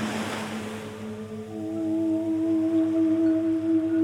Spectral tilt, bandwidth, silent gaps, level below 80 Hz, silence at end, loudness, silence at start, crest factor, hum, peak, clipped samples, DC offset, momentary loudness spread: -6 dB/octave; 11.5 kHz; none; -66 dBFS; 0 s; -26 LUFS; 0 s; 10 dB; none; -16 dBFS; under 0.1%; under 0.1%; 13 LU